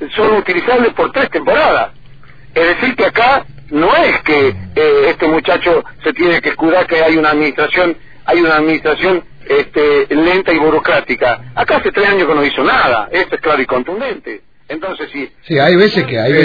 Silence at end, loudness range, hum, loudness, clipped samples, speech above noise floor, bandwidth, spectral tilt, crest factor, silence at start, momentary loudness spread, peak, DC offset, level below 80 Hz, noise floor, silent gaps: 0 s; 2 LU; none; -12 LUFS; under 0.1%; 28 dB; 5 kHz; -7 dB/octave; 12 dB; 0 s; 10 LU; 0 dBFS; 2%; -40 dBFS; -39 dBFS; none